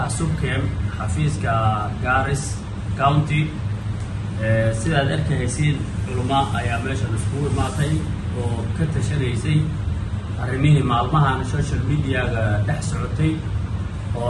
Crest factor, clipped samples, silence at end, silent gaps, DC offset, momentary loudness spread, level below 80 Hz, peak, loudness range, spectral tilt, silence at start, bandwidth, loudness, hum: 18 dB; under 0.1%; 0 s; none; under 0.1%; 8 LU; -32 dBFS; -4 dBFS; 2 LU; -6.5 dB/octave; 0 s; 11.5 kHz; -22 LUFS; none